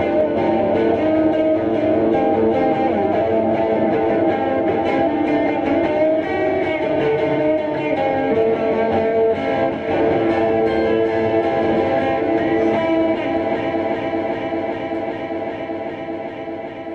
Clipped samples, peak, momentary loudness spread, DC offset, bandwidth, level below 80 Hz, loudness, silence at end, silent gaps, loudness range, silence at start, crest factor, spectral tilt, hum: under 0.1%; -6 dBFS; 8 LU; under 0.1%; 6.6 kHz; -48 dBFS; -18 LUFS; 0 s; none; 3 LU; 0 s; 12 dB; -8 dB/octave; none